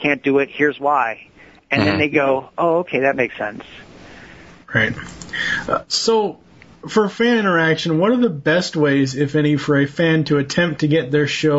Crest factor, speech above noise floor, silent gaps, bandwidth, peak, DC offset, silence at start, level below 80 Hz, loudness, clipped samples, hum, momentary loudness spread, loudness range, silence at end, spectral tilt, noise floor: 18 dB; 24 dB; none; 8 kHz; -2 dBFS; under 0.1%; 0 s; -52 dBFS; -18 LUFS; under 0.1%; none; 7 LU; 5 LU; 0 s; -5.5 dB/octave; -42 dBFS